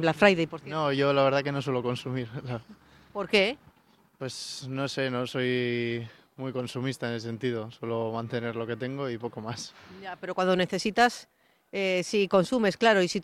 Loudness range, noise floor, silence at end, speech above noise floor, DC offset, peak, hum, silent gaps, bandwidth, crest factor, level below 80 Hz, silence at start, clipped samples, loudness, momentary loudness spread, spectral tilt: 6 LU; -63 dBFS; 0 s; 35 dB; under 0.1%; -6 dBFS; none; none; 13.5 kHz; 22 dB; -64 dBFS; 0 s; under 0.1%; -28 LUFS; 15 LU; -5 dB/octave